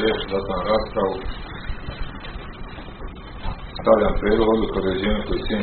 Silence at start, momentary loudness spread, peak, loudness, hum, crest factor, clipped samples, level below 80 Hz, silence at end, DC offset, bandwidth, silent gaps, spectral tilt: 0 s; 18 LU; -2 dBFS; -22 LUFS; none; 20 dB; under 0.1%; -32 dBFS; 0 s; under 0.1%; 4.5 kHz; none; -4.5 dB/octave